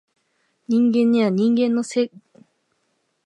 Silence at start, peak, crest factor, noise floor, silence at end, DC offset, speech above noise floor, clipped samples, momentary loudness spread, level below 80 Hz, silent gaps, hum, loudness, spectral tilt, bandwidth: 0.7 s; -8 dBFS; 14 dB; -70 dBFS; 1.2 s; under 0.1%; 52 dB; under 0.1%; 7 LU; -72 dBFS; none; none; -19 LUFS; -6.5 dB/octave; 9.6 kHz